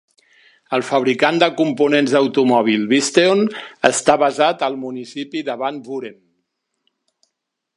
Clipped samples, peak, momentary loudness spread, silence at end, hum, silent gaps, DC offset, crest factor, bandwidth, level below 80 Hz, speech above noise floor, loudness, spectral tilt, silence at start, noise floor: under 0.1%; 0 dBFS; 13 LU; 1.65 s; none; none; under 0.1%; 18 dB; 11.5 kHz; -66 dBFS; 60 dB; -17 LUFS; -4 dB/octave; 0.7 s; -77 dBFS